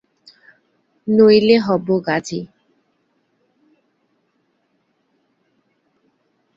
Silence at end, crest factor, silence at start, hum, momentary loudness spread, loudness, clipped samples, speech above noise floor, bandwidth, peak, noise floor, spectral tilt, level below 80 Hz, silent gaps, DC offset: 4.1 s; 20 dB; 1.05 s; none; 19 LU; -15 LUFS; under 0.1%; 52 dB; 7.6 kHz; -2 dBFS; -66 dBFS; -6 dB/octave; -62 dBFS; none; under 0.1%